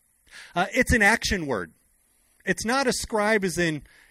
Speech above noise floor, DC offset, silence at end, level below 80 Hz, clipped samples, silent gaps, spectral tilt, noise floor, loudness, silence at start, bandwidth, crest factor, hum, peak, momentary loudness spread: 40 dB; under 0.1%; 0.3 s; -42 dBFS; under 0.1%; none; -4 dB/octave; -65 dBFS; -24 LUFS; 0.35 s; 16 kHz; 18 dB; none; -6 dBFS; 13 LU